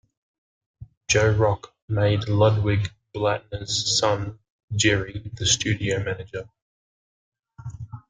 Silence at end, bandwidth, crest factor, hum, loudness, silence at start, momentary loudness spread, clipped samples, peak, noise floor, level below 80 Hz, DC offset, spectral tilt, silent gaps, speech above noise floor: 0.1 s; 9.6 kHz; 20 dB; none; -23 LUFS; 0.8 s; 16 LU; under 0.1%; -6 dBFS; under -90 dBFS; -48 dBFS; under 0.1%; -4 dB/octave; 0.97-1.01 s, 1.82-1.88 s, 4.50-4.68 s, 6.62-7.32 s; over 68 dB